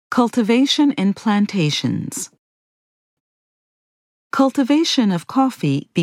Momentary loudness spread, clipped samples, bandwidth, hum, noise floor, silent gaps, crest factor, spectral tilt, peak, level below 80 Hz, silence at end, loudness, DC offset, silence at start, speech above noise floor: 9 LU; under 0.1%; 14.5 kHz; none; under -90 dBFS; 2.39-4.30 s; 16 dB; -5 dB/octave; -2 dBFS; -72 dBFS; 0 s; -18 LUFS; under 0.1%; 0.1 s; over 73 dB